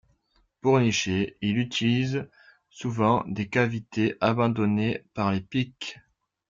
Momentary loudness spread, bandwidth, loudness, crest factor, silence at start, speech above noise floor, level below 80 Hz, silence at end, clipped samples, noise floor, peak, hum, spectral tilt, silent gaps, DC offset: 10 LU; 7.6 kHz; -26 LUFS; 18 dB; 0.65 s; 43 dB; -60 dBFS; 0.55 s; under 0.1%; -68 dBFS; -8 dBFS; none; -6 dB/octave; none; under 0.1%